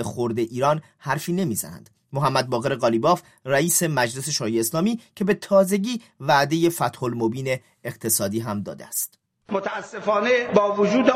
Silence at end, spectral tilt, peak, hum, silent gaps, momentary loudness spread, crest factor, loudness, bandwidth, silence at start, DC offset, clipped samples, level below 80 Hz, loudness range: 0 s; -4.5 dB/octave; 0 dBFS; none; none; 10 LU; 22 dB; -23 LUFS; 16 kHz; 0 s; under 0.1%; under 0.1%; -64 dBFS; 4 LU